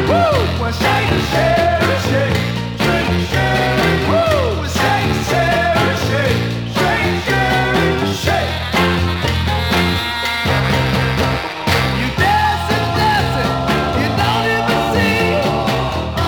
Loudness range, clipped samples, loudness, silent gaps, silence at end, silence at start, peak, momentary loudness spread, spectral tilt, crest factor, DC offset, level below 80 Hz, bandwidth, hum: 1 LU; under 0.1%; -15 LUFS; none; 0 s; 0 s; -2 dBFS; 3 LU; -5.5 dB/octave; 14 dB; under 0.1%; -32 dBFS; over 20 kHz; none